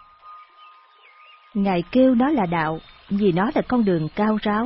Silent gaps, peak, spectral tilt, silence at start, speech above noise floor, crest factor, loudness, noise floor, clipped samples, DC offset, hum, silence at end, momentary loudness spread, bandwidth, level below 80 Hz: none; -6 dBFS; -11.5 dB/octave; 0.25 s; 31 dB; 16 dB; -21 LUFS; -51 dBFS; under 0.1%; under 0.1%; none; 0 s; 9 LU; 5.8 kHz; -50 dBFS